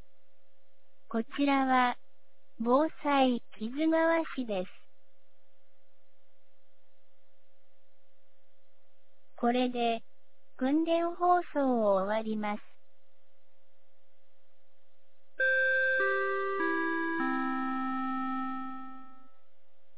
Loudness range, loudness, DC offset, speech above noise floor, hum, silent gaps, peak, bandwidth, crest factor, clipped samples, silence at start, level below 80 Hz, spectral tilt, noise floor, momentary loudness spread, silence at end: 8 LU; -30 LUFS; 1%; 44 dB; 50 Hz at -70 dBFS; none; -14 dBFS; 4 kHz; 18 dB; under 0.1%; 1.1 s; -78 dBFS; -2.5 dB/octave; -73 dBFS; 11 LU; 0.9 s